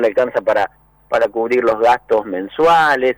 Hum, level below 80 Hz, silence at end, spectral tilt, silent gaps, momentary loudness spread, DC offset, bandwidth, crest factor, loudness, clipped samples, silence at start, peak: none; -52 dBFS; 0.05 s; -5 dB/octave; none; 8 LU; under 0.1%; over 20 kHz; 10 dB; -16 LUFS; under 0.1%; 0 s; -6 dBFS